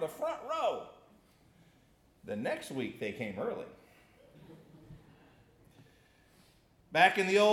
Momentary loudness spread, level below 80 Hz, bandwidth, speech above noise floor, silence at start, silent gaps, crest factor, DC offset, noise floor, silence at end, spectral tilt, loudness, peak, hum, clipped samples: 27 LU; -72 dBFS; 16 kHz; 35 dB; 0 s; none; 24 dB; under 0.1%; -66 dBFS; 0 s; -4 dB/octave; -33 LUFS; -12 dBFS; none; under 0.1%